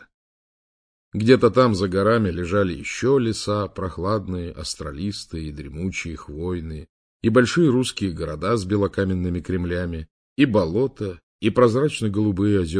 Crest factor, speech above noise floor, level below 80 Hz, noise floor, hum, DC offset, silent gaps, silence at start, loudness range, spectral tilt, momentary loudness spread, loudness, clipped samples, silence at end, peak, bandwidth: 20 dB; over 69 dB; -44 dBFS; under -90 dBFS; none; under 0.1%; 6.89-7.20 s, 10.11-10.36 s, 11.23-11.39 s; 1.15 s; 7 LU; -6.5 dB/octave; 13 LU; -22 LUFS; under 0.1%; 0 s; -2 dBFS; 10.5 kHz